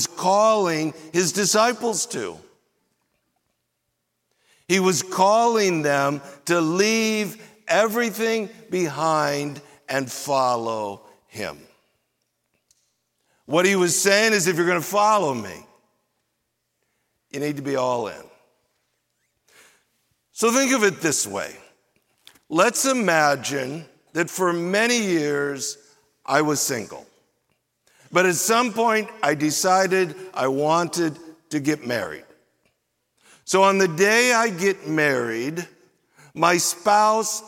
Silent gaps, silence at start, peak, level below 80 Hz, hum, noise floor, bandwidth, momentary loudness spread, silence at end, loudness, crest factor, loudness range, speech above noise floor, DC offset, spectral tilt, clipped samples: none; 0 s; -2 dBFS; -72 dBFS; none; -76 dBFS; 17 kHz; 14 LU; 0 s; -21 LUFS; 20 dB; 8 LU; 55 dB; under 0.1%; -3 dB/octave; under 0.1%